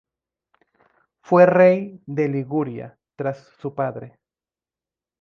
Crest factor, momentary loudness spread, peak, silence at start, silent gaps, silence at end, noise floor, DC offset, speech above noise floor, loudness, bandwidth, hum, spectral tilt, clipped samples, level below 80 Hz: 20 dB; 19 LU; -2 dBFS; 1.3 s; none; 1.15 s; under -90 dBFS; under 0.1%; over 71 dB; -20 LUFS; 6.4 kHz; none; -9.5 dB/octave; under 0.1%; -68 dBFS